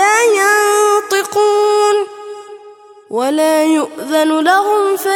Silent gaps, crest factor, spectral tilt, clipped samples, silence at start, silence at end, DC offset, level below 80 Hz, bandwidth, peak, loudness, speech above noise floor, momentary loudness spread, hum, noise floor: none; 12 dB; -1.5 dB/octave; under 0.1%; 0 s; 0 s; under 0.1%; -68 dBFS; 17.5 kHz; 0 dBFS; -13 LUFS; 26 dB; 12 LU; none; -39 dBFS